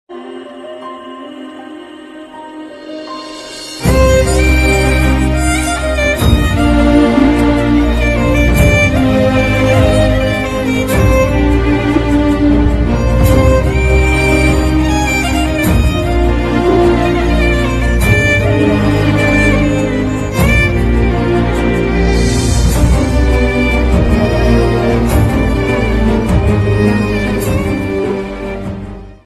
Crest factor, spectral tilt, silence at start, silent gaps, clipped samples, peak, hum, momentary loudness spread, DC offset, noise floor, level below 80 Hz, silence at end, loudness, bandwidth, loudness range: 12 dB; -6 dB/octave; 0.1 s; none; under 0.1%; 0 dBFS; none; 16 LU; under 0.1%; -31 dBFS; -16 dBFS; 0.1 s; -12 LUFS; 13.5 kHz; 3 LU